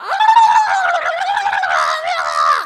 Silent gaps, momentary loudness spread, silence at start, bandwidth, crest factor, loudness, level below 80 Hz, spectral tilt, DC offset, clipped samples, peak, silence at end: none; 7 LU; 0 s; 12.5 kHz; 14 dB; -14 LUFS; -62 dBFS; 1 dB/octave; under 0.1%; under 0.1%; 0 dBFS; 0 s